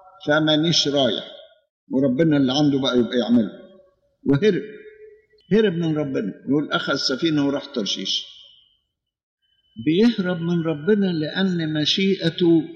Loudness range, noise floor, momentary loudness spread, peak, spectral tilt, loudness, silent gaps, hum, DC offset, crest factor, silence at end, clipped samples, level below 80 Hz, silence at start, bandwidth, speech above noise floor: 4 LU; -74 dBFS; 8 LU; -6 dBFS; -5.5 dB/octave; -21 LUFS; 1.70-1.87 s, 9.23-9.37 s; none; under 0.1%; 16 dB; 0 s; under 0.1%; -60 dBFS; 0.2 s; 7.6 kHz; 54 dB